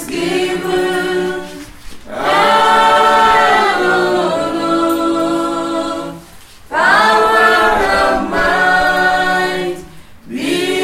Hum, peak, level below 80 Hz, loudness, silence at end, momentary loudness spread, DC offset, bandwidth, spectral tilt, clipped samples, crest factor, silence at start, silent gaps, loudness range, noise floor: none; 0 dBFS; -40 dBFS; -13 LUFS; 0 s; 13 LU; under 0.1%; 16.5 kHz; -3.5 dB/octave; under 0.1%; 14 dB; 0 s; none; 3 LU; -37 dBFS